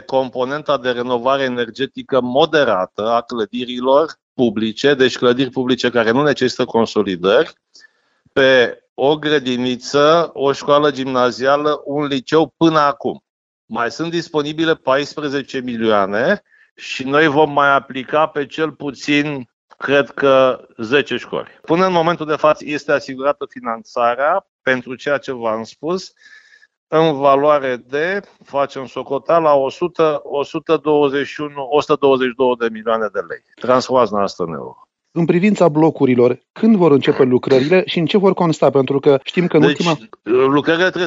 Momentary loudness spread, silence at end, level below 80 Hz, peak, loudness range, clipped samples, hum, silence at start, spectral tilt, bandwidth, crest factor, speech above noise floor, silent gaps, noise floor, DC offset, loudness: 10 LU; 0 s; -60 dBFS; 0 dBFS; 4 LU; under 0.1%; none; 0.1 s; -6 dB/octave; 7.8 kHz; 16 dB; 41 dB; 4.22-4.36 s, 8.89-8.96 s, 13.30-13.68 s, 16.71-16.76 s, 19.53-19.68 s, 24.48-24.59 s, 26.77-26.87 s, 36.50-36.54 s; -57 dBFS; under 0.1%; -16 LUFS